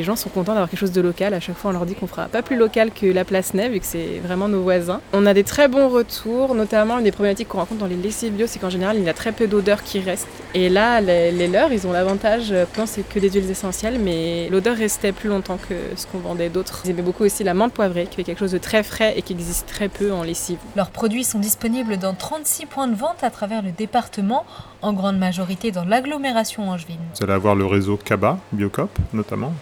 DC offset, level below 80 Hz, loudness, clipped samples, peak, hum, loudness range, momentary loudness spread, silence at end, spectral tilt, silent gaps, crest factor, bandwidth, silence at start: under 0.1%; -42 dBFS; -20 LUFS; under 0.1%; -2 dBFS; none; 4 LU; 8 LU; 0 s; -5 dB/octave; none; 18 dB; 19.5 kHz; 0 s